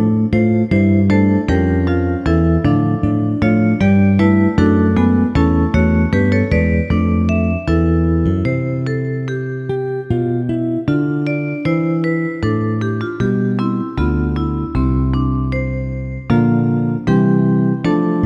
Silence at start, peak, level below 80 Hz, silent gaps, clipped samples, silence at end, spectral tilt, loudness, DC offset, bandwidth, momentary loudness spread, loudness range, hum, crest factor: 0 s; -2 dBFS; -28 dBFS; none; under 0.1%; 0 s; -9.5 dB/octave; -16 LUFS; under 0.1%; 7.4 kHz; 7 LU; 5 LU; none; 14 dB